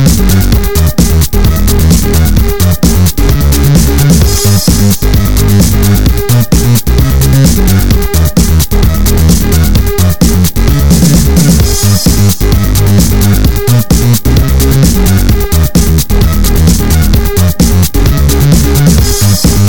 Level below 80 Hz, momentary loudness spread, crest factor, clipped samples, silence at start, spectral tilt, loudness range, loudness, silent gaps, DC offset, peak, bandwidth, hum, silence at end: -10 dBFS; 3 LU; 6 dB; 1%; 0 s; -5.5 dB/octave; 1 LU; -8 LUFS; none; 10%; 0 dBFS; 19 kHz; none; 0 s